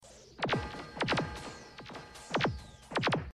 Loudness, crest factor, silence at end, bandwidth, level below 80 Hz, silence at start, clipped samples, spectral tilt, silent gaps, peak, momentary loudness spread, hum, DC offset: -34 LUFS; 18 dB; 0 s; 13 kHz; -54 dBFS; 0 s; under 0.1%; -5 dB/octave; none; -20 dBFS; 15 LU; none; under 0.1%